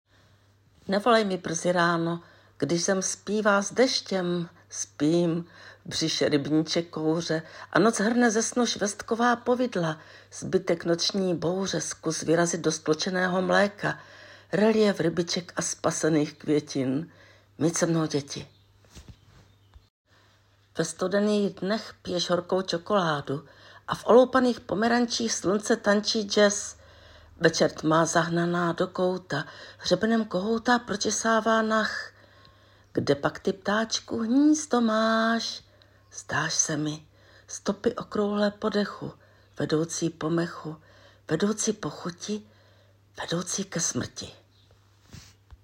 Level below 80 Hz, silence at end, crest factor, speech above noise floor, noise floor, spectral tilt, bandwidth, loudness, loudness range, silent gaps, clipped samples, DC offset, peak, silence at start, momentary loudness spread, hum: -62 dBFS; 0.1 s; 22 dB; 36 dB; -62 dBFS; -4 dB/octave; 16 kHz; -26 LUFS; 6 LU; 19.90-20.05 s; under 0.1%; under 0.1%; -4 dBFS; 0.85 s; 12 LU; none